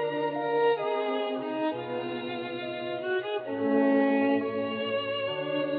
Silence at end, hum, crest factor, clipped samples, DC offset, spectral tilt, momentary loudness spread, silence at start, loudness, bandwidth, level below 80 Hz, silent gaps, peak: 0 s; none; 16 dB; under 0.1%; under 0.1%; -8.5 dB/octave; 10 LU; 0 s; -29 LUFS; 4.9 kHz; -78 dBFS; none; -14 dBFS